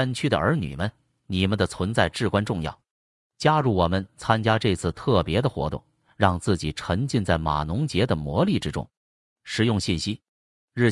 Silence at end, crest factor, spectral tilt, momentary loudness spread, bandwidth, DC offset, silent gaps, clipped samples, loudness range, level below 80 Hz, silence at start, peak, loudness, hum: 0 s; 20 dB; -6 dB/octave; 9 LU; 12 kHz; under 0.1%; 2.91-3.30 s, 8.97-9.36 s, 10.28-10.68 s; under 0.1%; 2 LU; -46 dBFS; 0 s; -4 dBFS; -24 LUFS; none